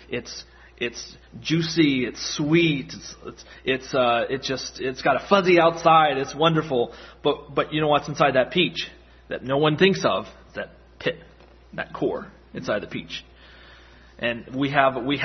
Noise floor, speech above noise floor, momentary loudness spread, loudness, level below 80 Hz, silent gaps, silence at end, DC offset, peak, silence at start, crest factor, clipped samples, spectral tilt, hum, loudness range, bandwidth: -49 dBFS; 26 dB; 18 LU; -22 LUFS; -52 dBFS; none; 0 s; under 0.1%; 0 dBFS; 0.1 s; 22 dB; under 0.1%; -5 dB/octave; none; 11 LU; 6.4 kHz